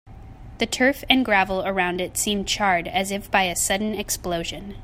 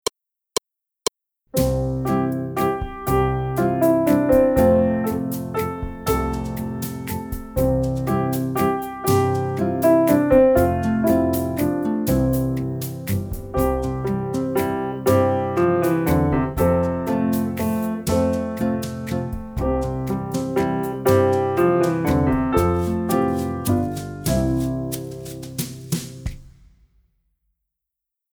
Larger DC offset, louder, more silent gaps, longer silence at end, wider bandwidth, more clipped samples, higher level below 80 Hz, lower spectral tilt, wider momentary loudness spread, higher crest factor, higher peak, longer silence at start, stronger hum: neither; about the same, -22 LUFS vs -21 LUFS; neither; second, 0 s vs 1.9 s; second, 16 kHz vs over 20 kHz; neither; second, -44 dBFS vs -36 dBFS; second, -2.5 dB/octave vs -6.5 dB/octave; second, 8 LU vs 11 LU; first, 24 dB vs 16 dB; first, 0 dBFS vs -4 dBFS; second, 0.05 s vs 1.55 s; neither